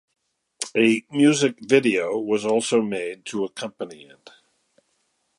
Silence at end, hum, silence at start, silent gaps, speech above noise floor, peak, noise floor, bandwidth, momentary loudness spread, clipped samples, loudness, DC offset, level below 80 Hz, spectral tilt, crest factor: 1.45 s; none; 0.6 s; none; 49 dB; -4 dBFS; -70 dBFS; 11.5 kHz; 14 LU; under 0.1%; -22 LUFS; under 0.1%; -70 dBFS; -4.5 dB/octave; 20 dB